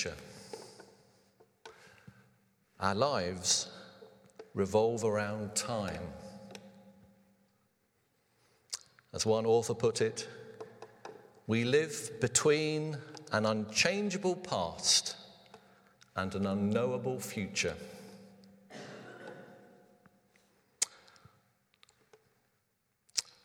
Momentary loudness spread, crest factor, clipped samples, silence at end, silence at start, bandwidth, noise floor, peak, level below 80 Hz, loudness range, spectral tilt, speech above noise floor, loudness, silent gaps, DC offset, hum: 22 LU; 26 dB; under 0.1%; 0.25 s; 0 s; 17 kHz; -79 dBFS; -10 dBFS; -68 dBFS; 13 LU; -3.5 dB/octave; 47 dB; -32 LUFS; none; under 0.1%; none